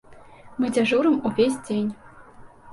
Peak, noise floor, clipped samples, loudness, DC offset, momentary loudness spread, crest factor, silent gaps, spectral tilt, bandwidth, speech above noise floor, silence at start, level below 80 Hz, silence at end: -8 dBFS; -46 dBFS; under 0.1%; -23 LUFS; under 0.1%; 14 LU; 16 dB; none; -5.5 dB/octave; 11.5 kHz; 24 dB; 0.1 s; -58 dBFS; 0 s